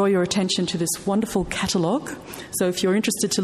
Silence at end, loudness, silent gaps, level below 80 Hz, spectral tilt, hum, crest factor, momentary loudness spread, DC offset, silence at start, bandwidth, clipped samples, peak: 0 s; -23 LUFS; none; -48 dBFS; -4 dB/octave; none; 14 dB; 6 LU; under 0.1%; 0 s; 14.5 kHz; under 0.1%; -8 dBFS